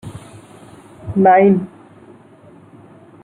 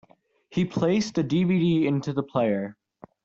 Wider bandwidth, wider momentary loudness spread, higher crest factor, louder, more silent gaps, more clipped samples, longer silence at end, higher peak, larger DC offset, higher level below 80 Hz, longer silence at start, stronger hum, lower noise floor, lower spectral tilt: first, 10.5 kHz vs 7.6 kHz; first, 25 LU vs 8 LU; about the same, 18 dB vs 14 dB; first, -13 LUFS vs -25 LUFS; neither; neither; first, 1.6 s vs 0.5 s; first, -2 dBFS vs -10 dBFS; neither; first, -54 dBFS vs -60 dBFS; second, 0.05 s vs 0.5 s; neither; second, -44 dBFS vs -58 dBFS; first, -9 dB/octave vs -7 dB/octave